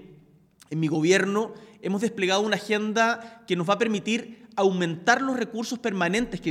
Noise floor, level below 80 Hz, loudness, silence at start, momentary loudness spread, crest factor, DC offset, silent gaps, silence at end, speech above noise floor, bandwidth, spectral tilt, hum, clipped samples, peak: -56 dBFS; -60 dBFS; -25 LUFS; 0 s; 8 LU; 20 dB; under 0.1%; none; 0 s; 31 dB; 15.5 kHz; -4.5 dB/octave; none; under 0.1%; -6 dBFS